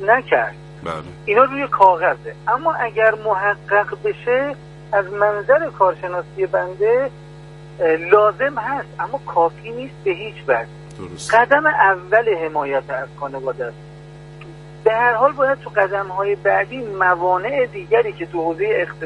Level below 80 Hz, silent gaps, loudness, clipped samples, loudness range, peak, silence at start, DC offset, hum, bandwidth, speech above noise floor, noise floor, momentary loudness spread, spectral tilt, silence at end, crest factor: -52 dBFS; none; -18 LUFS; under 0.1%; 3 LU; 0 dBFS; 0 s; under 0.1%; none; 11.5 kHz; 20 dB; -38 dBFS; 14 LU; -5.5 dB/octave; 0 s; 18 dB